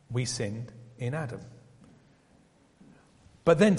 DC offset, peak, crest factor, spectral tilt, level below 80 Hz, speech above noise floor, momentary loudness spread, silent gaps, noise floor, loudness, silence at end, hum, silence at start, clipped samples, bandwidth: under 0.1%; -8 dBFS; 22 dB; -6 dB/octave; -60 dBFS; 35 dB; 19 LU; none; -62 dBFS; -31 LUFS; 0 s; none; 0.1 s; under 0.1%; 11.5 kHz